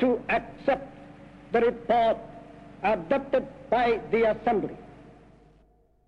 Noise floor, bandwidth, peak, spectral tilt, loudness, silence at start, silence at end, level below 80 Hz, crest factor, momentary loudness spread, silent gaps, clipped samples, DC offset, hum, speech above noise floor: -62 dBFS; 6.8 kHz; -12 dBFS; -7 dB/octave; -26 LUFS; 0 s; 1 s; -54 dBFS; 16 dB; 21 LU; none; under 0.1%; under 0.1%; none; 36 dB